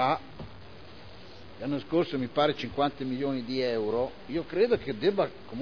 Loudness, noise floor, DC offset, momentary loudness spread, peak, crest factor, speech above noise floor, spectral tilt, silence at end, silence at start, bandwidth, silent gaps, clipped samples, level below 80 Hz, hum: -29 LUFS; -48 dBFS; 0.4%; 21 LU; -12 dBFS; 18 dB; 20 dB; -7 dB/octave; 0 s; 0 s; 5.4 kHz; none; under 0.1%; -58 dBFS; none